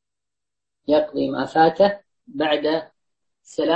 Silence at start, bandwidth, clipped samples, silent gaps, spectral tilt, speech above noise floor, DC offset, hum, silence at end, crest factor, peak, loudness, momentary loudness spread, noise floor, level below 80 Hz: 0.9 s; 8.4 kHz; under 0.1%; none; -6 dB/octave; 68 dB; under 0.1%; none; 0 s; 18 dB; -4 dBFS; -21 LUFS; 17 LU; -88 dBFS; -60 dBFS